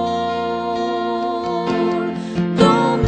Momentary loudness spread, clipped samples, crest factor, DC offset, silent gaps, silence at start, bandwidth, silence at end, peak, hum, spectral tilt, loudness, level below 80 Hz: 8 LU; under 0.1%; 18 dB; under 0.1%; none; 0 s; 9.2 kHz; 0 s; 0 dBFS; none; -6.5 dB/octave; -19 LUFS; -44 dBFS